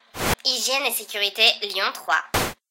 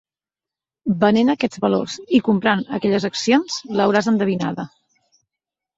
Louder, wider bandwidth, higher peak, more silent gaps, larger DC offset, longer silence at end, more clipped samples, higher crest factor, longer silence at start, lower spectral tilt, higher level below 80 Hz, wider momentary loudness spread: about the same, -21 LUFS vs -19 LUFS; first, 17 kHz vs 8 kHz; about the same, -2 dBFS vs -2 dBFS; neither; neither; second, 0.15 s vs 1.1 s; neither; about the same, 22 dB vs 18 dB; second, 0.15 s vs 0.85 s; second, -1.5 dB/octave vs -5.5 dB/octave; first, -44 dBFS vs -60 dBFS; about the same, 8 LU vs 8 LU